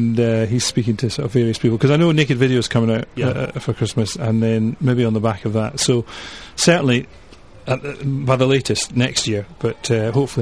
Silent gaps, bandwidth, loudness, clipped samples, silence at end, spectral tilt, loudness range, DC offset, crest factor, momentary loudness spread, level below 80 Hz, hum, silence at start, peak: none; 11 kHz; -18 LUFS; under 0.1%; 0 s; -5.5 dB/octave; 2 LU; 0.5%; 16 dB; 8 LU; -46 dBFS; none; 0 s; -2 dBFS